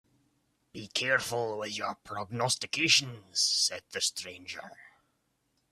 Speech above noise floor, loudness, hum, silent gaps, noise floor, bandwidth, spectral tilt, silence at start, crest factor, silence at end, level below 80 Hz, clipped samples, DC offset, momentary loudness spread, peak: 44 dB; -29 LUFS; none; none; -76 dBFS; 15.5 kHz; -1.5 dB/octave; 0.75 s; 24 dB; 0.85 s; -72 dBFS; under 0.1%; under 0.1%; 18 LU; -8 dBFS